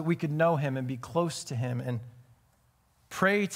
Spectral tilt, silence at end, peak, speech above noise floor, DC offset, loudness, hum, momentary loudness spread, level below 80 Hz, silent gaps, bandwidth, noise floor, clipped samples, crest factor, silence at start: -6 dB/octave; 0 s; -10 dBFS; 38 dB; under 0.1%; -30 LUFS; none; 11 LU; -68 dBFS; none; 16 kHz; -67 dBFS; under 0.1%; 20 dB; 0 s